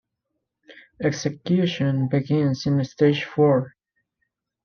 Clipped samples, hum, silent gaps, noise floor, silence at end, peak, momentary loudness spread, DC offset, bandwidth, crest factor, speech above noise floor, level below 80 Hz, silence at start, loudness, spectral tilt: under 0.1%; none; none; -79 dBFS; 0.95 s; -6 dBFS; 7 LU; under 0.1%; 6.8 kHz; 16 dB; 58 dB; -64 dBFS; 0.7 s; -22 LUFS; -7 dB/octave